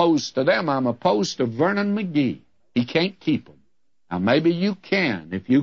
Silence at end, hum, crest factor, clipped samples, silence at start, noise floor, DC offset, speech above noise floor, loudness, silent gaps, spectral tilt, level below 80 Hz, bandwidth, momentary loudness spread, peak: 0 s; none; 16 dB; under 0.1%; 0 s; -71 dBFS; 0.1%; 49 dB; -22 LUFS; none; -6 dB/octave; -64 dBFS; 7.6 kHz; 7 LU; -6 dBFS